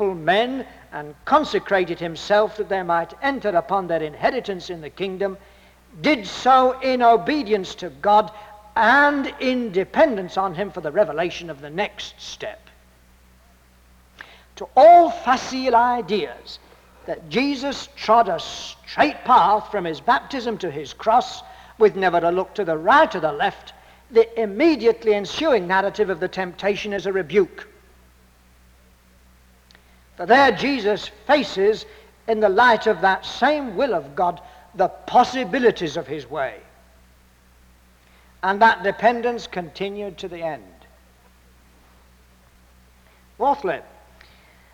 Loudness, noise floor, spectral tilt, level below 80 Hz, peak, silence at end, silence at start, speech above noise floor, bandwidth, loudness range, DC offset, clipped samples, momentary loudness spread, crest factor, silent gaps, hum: -20 LUFS; -54 dBFS; -5 dB/octave; -52 dBFS; -4 dBFS; 0.9 s; 0 s; 34 dB; 15 kHz; 10 LU; under 0.1%; under 0.1%; 16 LU; 18 dB; none; none